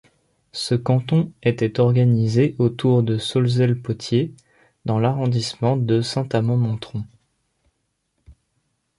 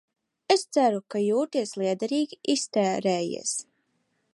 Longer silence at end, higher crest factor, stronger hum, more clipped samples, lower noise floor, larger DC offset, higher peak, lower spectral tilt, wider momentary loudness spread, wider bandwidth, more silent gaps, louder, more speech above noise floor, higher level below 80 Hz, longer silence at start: about the same, 0.65 s vs 0.7 s; about the same, 16 dB vs 20 dB; neither; neither; about the same, -72 dBFS vs -73 dBFS; neither; about the same, -4 dBFS vs -6 dBFS; first, -7 dB/octave vs -4 dB/octave; first, 11 LU vs 5 LU; about the same, 11.5 kHz vs 11.5 kHz; neither; first, -20 LUFS vs -26 LUFS; first, 53 dB vs 47 dB; first, -54 dBFS vs -78 dBFS; about the same, 0.55 s vs 0.5 s